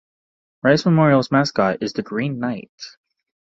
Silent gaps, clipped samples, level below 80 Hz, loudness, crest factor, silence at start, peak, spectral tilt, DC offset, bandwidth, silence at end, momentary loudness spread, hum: 2.69-2.78 s; under 0.1%; -58 dBFS; -19 LUFS; 18 dB; 0.65 s; -2 dBFS; -6.5 dB/octave; under 0.1%; 7.8 kHz; 0.65 s; 19 LU; none